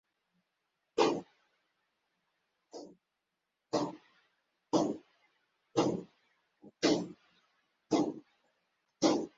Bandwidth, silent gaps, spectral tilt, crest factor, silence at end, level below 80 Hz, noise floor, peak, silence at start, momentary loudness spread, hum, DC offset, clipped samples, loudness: 8 kHz; none; -4.5 dB/octave; 24 dB; 0.1 s; -78 dBFS; -86 dBFS; -14 dBFS; 0.95 s; 20 LU; none; under 0.1%; under 0.1%; -34 LUFS